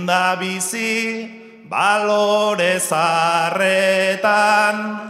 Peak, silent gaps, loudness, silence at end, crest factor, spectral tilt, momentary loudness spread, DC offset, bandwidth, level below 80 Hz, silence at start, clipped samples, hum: -2 dBFS; none; -17 LUFS; 0 s; 16 dB; -3 dB/octave; 6 LU; under 0.1%; 16 kHz; -72 dBFS; 0 s; under 0.1%; none